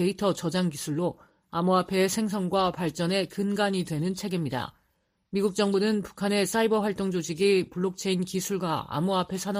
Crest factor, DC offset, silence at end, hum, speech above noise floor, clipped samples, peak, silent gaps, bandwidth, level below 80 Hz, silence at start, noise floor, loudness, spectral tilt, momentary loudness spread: 16 dB; under 0.1%; 0 s; none; 46 dB; under 0.1%; -12 dBFS; none; 15.5 kHz; -62 dBFS; 0 s; -73 dBFS; -27 LUFS; -5 dB/octave; 6 LU